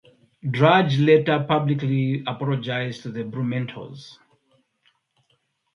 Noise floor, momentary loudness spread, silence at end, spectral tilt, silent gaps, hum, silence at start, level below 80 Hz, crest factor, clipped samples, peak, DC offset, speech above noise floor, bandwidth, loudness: -69 dBFS; 16 LU; 1.65 s; -7.5 dB/octave; none; none; 0.45 s; -66 dBFS; 22 dB; under 0.1%; -2 dBFS; under 0.1%; 48 dB; 6.8 kHz; -22 LUFS